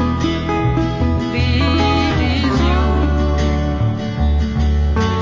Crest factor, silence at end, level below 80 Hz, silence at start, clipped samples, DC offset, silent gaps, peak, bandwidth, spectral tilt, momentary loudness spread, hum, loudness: 12 dB; 0 s; -20 dBFS; 0 s; under 0.1%; under 0.1%; none; -4 dBFS; 7.6 kHz; -7 dB/octave; 3 LU; none; -17 LUFS